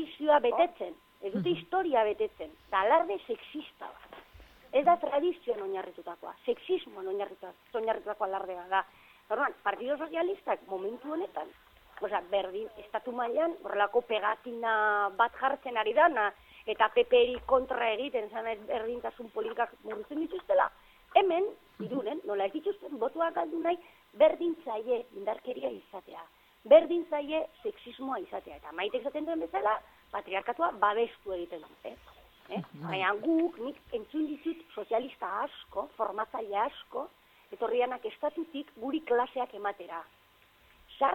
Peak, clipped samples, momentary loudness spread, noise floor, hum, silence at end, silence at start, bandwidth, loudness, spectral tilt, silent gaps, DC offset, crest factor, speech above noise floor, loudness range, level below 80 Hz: -8 dBFS; under 0.1%; 16 LU; -63 dBFS; none; 0 s; 0 s; 16.5 kHz; -31 LUFS; -6.5 dB/octave; none; under 0.1%; 24 dB; 32 dB; 6 LU; -68 dBFS